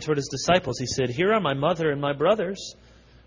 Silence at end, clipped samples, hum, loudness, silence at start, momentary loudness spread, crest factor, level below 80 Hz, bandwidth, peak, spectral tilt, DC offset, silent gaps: 0.55 s; under 0.1%; none; -24 LUFS; 0 s; 7 LU; 18 dB; -52 dBFS; 7.6 kHz; -8 dBFS; -4.5 dB/octave; under 0.1%; none